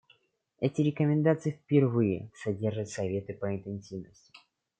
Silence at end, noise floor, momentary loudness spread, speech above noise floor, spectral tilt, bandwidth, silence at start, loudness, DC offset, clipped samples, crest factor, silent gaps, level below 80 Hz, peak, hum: 0.75 s; -67 dBFS; 13 LU; 38 dB; -8 dB/octave; 9.2 kHz; 0.6 s; -30 LUFS; under 0.1%; under 0.1%; 20 dB; none; -70 dBFS; -10 dBFS; none